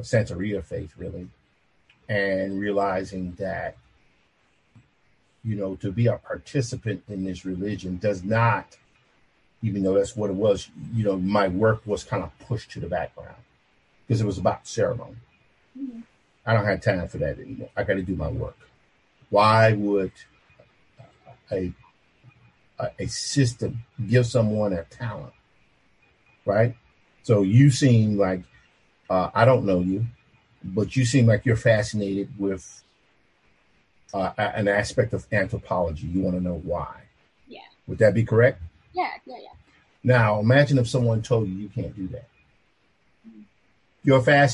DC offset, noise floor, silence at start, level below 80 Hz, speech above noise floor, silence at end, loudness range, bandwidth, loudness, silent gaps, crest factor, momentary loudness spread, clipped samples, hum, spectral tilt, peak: under 0.1%; -66 dBFS; 0 s; -48 dBFS; 43 dB; 0 s; 8 LU; 11.5 kHz; -24 LUFS; none; 22 dB; 16 LU; under 0.1%; none; -6.5 dB/octave; -4 dBFS